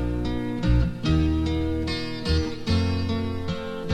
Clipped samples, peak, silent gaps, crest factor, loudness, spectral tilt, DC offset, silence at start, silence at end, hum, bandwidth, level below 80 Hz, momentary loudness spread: under 0.1%; -10 dBFS; none; 14 dB; -26 LUFS; -7 dB/octave; 0.6%; 0 s; 0 s; none; 10.5 kHz; -30 dBFS; 6 LU